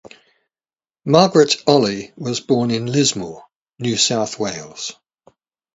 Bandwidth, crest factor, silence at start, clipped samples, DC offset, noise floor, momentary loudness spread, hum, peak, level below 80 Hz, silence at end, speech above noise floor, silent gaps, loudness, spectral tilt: 8 kHz; 20 dB; 1.05 s; under 0.1%; under 0.1%; under -90 dBFS; 16 LU; none; 0 dBFS; -58 dBFS; 0.85 s; over 73 dB; 3.56-3.61 s; -17 LUFS; -4 dB/octave